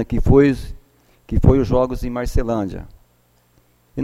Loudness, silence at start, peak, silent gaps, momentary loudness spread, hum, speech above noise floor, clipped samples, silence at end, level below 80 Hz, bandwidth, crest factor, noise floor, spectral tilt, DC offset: -18 LUFS; 0 s; 0 dBFS; none; 17 LU; 60 Hz at -40 dBFS; 42 dB; under 0.1%; 0 s; -26 dBFS; 13.5 kHz; 18 dB; -58 dBFS; -8.5 dB/octave; under 0.1%